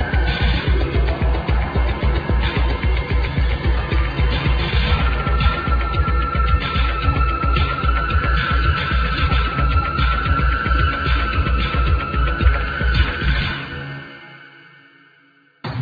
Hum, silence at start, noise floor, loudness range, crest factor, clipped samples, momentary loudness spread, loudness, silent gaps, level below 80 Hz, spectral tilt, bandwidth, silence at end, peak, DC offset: none; 0 s; -54 dBFS; 2 LU; 16 dB; under 0.1%; 3 LU; -19 LUFS; none; -20 dBFS; -8 dB/octave; 5 kHz; 0 s; -2 dBFS; under 0.1%